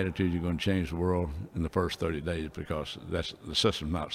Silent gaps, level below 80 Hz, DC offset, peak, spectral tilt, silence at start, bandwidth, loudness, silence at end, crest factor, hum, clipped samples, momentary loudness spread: none; -44 dBFS; under 0.1%; -12 dBFS; -5.5 dB/octave; 0 s; 15 kHz; -31 LUFS; 0 s; 20 dB; none; under 0.1%; 8 LU